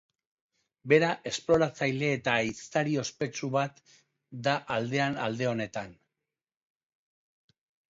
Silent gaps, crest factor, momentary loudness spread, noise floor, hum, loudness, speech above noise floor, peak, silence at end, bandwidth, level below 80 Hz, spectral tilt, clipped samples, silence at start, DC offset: none; 22 dB; 11 LU; -90 dBFS; none; -29 LUFS; 61 dB; -8 dBFS; 2 s; 7.8 kHz; -66 dBFS; -5 dB/octave; under 0.1%; 0.85 s; under 0.1%